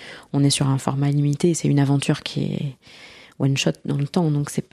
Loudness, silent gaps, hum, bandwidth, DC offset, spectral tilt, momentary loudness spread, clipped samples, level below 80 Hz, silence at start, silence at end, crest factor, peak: -21 LUFS; none; none; 13 kHz; under 0.1%; -5.5 dB/octave; 7 LU; under 0.1%; -56 dBFS; 0 s; 0.1 s; 18 dB; -2 dBFS